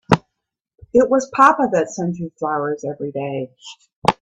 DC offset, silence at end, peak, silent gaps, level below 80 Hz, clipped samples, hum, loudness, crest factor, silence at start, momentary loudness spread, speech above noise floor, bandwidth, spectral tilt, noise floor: under 0.1%; 0.1 s; 0 dBFS; 3.96-4.02 s; -54 dBFS; under 0.1%; none; -19 LUFS; 20 dB; 0.1 s; 15 LU; 60 dB; 11 kHz; -6 dB/octave; -78 dBFS